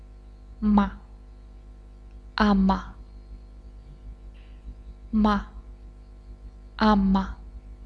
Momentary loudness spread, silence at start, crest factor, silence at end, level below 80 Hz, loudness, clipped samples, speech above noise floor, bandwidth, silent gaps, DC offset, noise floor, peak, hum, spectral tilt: 26 LU; 0 s; 22 dB; 0 s; -38 dBFS; -24 LUFS; under 0.1%; 24 dB; 6.2 kHz; none; under 0.1%; -45 dBFS; -6 dBFS; 50 Hz at -40 dBFS; -8 dB/octave